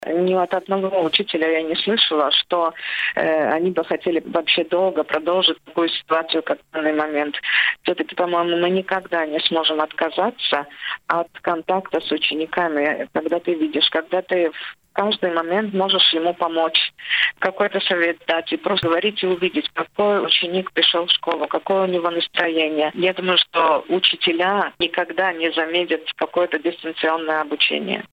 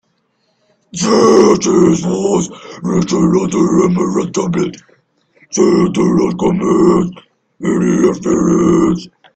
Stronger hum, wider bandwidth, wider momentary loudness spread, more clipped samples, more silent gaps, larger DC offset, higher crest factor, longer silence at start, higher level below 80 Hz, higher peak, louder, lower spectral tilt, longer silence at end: neither; about the same, 8.2 kHz vs 9 kHz; second, 6 LU vs 10 LU; neither; neither; neither; first, 20 dB vs 14 dB; second, 0 s vs 0.95 s; second, -66 dBFS vs -44 dBFS; about the same, 0 dBFS vs 0 dBFS; second, -20 LUFS vs -13 LUFS; about the same, -6 dB/octave vs -6 dB/octave; second, 0.05 s vs 0.3 s